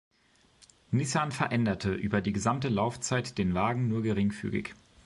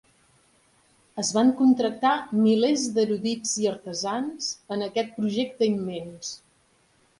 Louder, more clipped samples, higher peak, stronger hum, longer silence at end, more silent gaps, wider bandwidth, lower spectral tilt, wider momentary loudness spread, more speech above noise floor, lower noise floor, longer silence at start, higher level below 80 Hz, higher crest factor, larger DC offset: second, -30 LUFS vs -25 LUFS; neither; about the same, -12 dBFS vs -10 dBFS; neither; second, 0.3 s vs 0.85 s; neither; about the same, 11.5 kHz vs 11.5 kHz; first, -5.5 dB/octave vs -4 dB/octave; second, 4 LU vs 13 LU; about the same, 36 dB vs 39 dB; about the same, -65 dBFS vs -64 dBFS; second, 0.9 s vs 1.15 s; first, -52 dBFS vs -68 dBFS; about the same, 18 dB vs 16 dB; neither